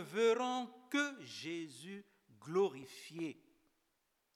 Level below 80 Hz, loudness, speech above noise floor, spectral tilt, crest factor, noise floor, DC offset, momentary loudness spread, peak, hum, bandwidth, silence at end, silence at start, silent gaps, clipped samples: under -90 dBFS; -39 LUFS; 44 dB; -4 dB/octave; 18 dB; -82 dBFS; under 0.1%; 18 LU; -22 dBFS; none; 14 kHz; 1 s; 0 s; none; under 0.1%